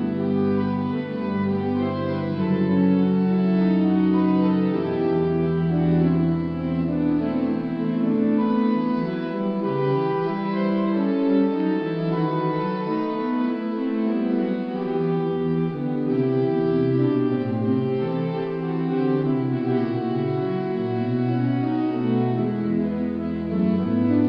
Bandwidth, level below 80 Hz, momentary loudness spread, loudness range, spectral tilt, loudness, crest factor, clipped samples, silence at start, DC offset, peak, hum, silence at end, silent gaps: 5.6 kHz; -54 dBFS; 6 LU; 3 LU; -11 dB/octave; -23 LUFS; 12 dB; under 0.1%; 0 s; under 0.1%; -8 dBFS; none; 0 s; none